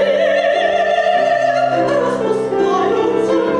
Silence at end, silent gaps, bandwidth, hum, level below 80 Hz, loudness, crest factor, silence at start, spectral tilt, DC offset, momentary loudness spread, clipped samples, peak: 0 s; none; 10.5 kHz; none; -54 dBFS; -15 LUFS; 10 dB; 0 s; -5 dB/octave; under 0.1%; 2 LU; under 0.1%; -4 dBFS